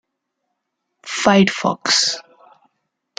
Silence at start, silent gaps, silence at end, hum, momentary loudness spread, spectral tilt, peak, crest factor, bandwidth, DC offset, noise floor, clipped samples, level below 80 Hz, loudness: 1.05 s; none; 1 s; none; 12 LU; -3.5 dB/octave; -2 dBFS; 20 dB; 9.6 kHz; under 0.1%; -76 dBFS; under 0.1%; -60 dBFS; -16 LUFS